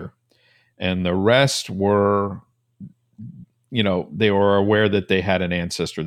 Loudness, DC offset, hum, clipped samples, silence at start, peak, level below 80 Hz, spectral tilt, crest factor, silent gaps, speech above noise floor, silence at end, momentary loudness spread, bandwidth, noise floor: -20 LUFS; under 0.1%; none; under 0.1%; 0 s; -4 dBFS; -54 dBFS; -5.5 dB/octave; 18 dB; none; 41 dB; 0 s; 17 LU; 15 kHz; -60 dBFS